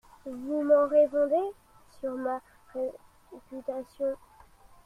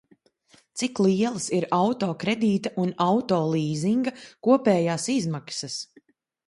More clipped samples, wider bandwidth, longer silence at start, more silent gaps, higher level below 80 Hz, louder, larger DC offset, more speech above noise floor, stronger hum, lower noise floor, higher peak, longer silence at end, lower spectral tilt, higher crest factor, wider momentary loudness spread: neither; about the same, 11 kHz vs 11.5 kHz; second, 0.25 s vs 0.75 s; neither; about the same, -64 dBFS vs -68 dBFS; second, -29 LUFS vs -24 LUFS; neither; second, 27 dB vs 37 dB; neither; second, -55 dBFS vs -61 dBFS; second, -12 dBFS vs -6 dBFS; about the same, 0.7 s vs 0.65 s; about the same, -6.5 dB/octave vs -5.5 dB/octave; about the same, 18 dB vs 18 dB; first, 18 LU vs 9 LU